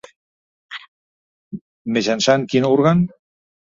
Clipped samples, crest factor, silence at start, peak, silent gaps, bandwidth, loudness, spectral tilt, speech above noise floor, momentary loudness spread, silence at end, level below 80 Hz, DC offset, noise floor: under 0.1%; 18 dB; 0.7 s; -2 dBFS; 0.88-1.51 s, 1.61-1.85 s; 7.6 kHz; -17 LUFS; -5.5 dB/octave; over 74 dB; 21 LU; 0.7 s; -56 dBFS; under 0.1%; under -90 dBFS